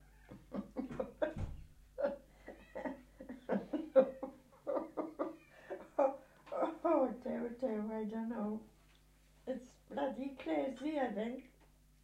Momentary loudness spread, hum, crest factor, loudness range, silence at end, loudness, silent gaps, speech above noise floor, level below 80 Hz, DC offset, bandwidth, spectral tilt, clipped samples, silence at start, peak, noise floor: 18 LU; none; 24 dB; 5 LU; 0.55 s; -40 LUFS; none; 27 dB; -62 dBFS; under 0.1%; 12.5 kHz; -7.5 dB/octave; under 0.1%; 0 s; -16 dBFS; -66 dBFS